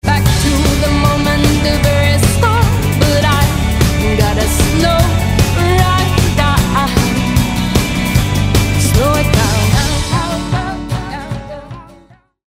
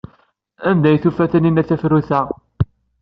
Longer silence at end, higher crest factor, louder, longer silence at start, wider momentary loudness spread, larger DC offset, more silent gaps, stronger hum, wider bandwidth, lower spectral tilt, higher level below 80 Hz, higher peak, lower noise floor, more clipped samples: first, 0.6 s vs 0.35 s; about the same, 12 dB vs 14 dB; first, -13 LUFS vs -17 LUFS; second, 0.05 s vs 0.6 s; second, 7 LU vs 10 LU; neither; neither; neither; first, 16 kHz vs 5.4 kHz; second, -5 dB/octave vs -8 dB/octave; first, -20 dBFS vs -44 dBFS; about the same, 0 dBFS vs -2 dBFS; second, -45 dBFS vs -57 dBFS; neither